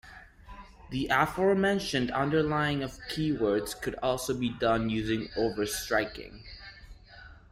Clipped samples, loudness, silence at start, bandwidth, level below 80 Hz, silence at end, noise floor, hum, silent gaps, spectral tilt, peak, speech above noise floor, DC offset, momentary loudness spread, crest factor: under 0.1%; -29 LUFS; 0.05 s; 16 kHz; -50 dBFS; 0.2 s; -51 dBFS; none; none; -5 dB/octave; -10 dBFS; 22 dB; under 0.1%; 20 LU; 20 dB